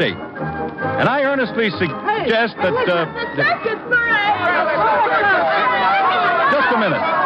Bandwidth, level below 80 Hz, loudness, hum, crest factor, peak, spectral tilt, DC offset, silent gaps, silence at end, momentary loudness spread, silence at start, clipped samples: 7.6 kHz; -52 dBFS; -17 LUFS; none; 12 dB; -6 dBFS; -7 dB/octave; under 0.1%; none; 0 s; 7 LU; 0 s; under 0.1%